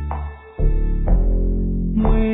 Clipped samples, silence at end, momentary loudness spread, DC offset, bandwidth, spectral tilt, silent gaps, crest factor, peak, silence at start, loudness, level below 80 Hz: under 0.1%; 0 s; 9 LU; under 0.1%; 3.7 kHz; -12.5 dB/octave; none; 12 dB; -6 dBFS; 0 s; -22 LUFS; -18 dBFS